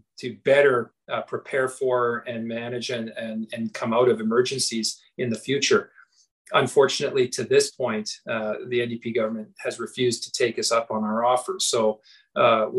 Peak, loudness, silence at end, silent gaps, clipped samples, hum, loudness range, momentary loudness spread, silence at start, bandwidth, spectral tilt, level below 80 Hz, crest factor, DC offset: -6 dBFS; -24 LUFS; 0 s; 6.31-6.45 s; under 0.1%; none; 3 LU; 11 LU; 0.2 s; 12.5 kHz; -3.5 dB/octave; -72 dBFS; 18 dB; under 0.1%